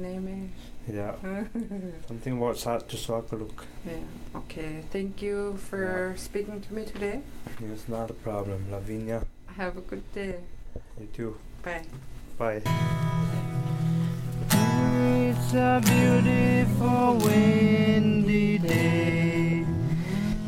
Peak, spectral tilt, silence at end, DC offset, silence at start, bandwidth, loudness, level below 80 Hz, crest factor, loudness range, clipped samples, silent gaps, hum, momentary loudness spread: -8 dBFS; -6.5 dB/octave; 0 s; under 0.1%; 0 s; 16.5 kHz; -26 LUFS; -42 dBFS; 18 dB; 14 LU; under 0.1%; none; none; 19 LU